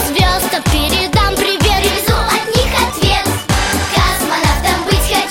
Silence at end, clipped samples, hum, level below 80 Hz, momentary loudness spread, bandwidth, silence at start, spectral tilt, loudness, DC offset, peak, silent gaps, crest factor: 0 s; under 0.1%; none; -20 dBFS; 2 LU; 17 kHz; 0 s; -3.5 dB/octave; -13 LUFS; under 0.1%; 0 dBFS; none; 14 dB